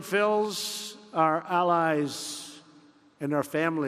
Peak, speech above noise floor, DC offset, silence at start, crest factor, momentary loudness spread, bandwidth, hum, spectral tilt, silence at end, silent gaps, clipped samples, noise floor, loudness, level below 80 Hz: -10 dBFS; 31 dB; under 0.1%; 0 s; 18 dB; 12 LU; 14.5 kHz; none; -4 dB/octave; 0 s; none; under 0.1%; -57 dBFS; -27 LUFS; -78 dBFS